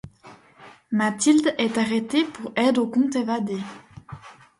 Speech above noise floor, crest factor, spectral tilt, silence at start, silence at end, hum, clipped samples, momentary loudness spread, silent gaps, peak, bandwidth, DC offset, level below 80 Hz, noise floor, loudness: 27 dB; 16 dB; -4 dB/octave; 0.05 s; 0.3 s; none; under 0.1%; 21 LU; none; -8 dBFS; 11.5 kHz; under 0.1%; -62 dBFS; -49 dBFS; -22 LUFS